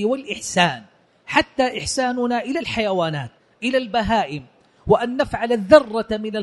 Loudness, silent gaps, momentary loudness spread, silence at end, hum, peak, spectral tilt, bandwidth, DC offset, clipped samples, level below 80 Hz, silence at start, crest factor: -20 LUFS; none; 13 LU; 0 s; none; 0 dBFS; -4.5 dB/octave; 11.5 kHz; under 0.1%; under 0.1%; -46 dBFS; 0 s; 20 dB